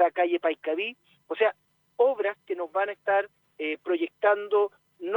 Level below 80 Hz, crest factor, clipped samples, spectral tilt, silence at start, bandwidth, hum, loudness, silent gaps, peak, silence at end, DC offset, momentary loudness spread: -88 dBFS; 18 dB; under 0.1%; -5.5 dB/octave; 0 s; 19.5 kHz; none; -27 LUFS; none; -8 dBFS; 0 s; under 0.1%; 10 LU